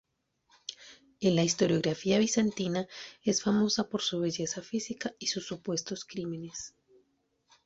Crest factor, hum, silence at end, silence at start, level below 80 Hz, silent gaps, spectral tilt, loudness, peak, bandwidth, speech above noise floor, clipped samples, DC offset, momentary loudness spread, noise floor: 18 dB; none; 0.95 s; 0.7 s; -68 dBFS; none; -4.5 dB/octave; -30 LUFS; -14 dBFS; 8.2 kHz; 43 dB; under 0.1%; under 0.1%; 16 LU; -74 dBFS